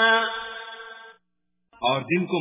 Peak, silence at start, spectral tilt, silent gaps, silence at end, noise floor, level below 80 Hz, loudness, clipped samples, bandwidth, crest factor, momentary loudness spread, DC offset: -8 dBFS; 0 s; -8.5 dB/octave; none; 0 s; -79 dBFS; -68 dBFS; -25 LUFS; under 0.1%; 3.9 kHz; 18 dB; 19 LU; under 0.1%